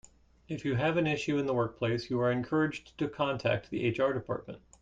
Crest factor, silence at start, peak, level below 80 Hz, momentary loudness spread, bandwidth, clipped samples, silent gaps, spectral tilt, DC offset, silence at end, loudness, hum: 16 dB; 0.5 s; -16 dBFS; -60 dBFS; 8 LU; 9.2 kHz; under 0.1%; none; -6.5 dB/octave; under 0.1%; 0.25 s; -31 LUFS; none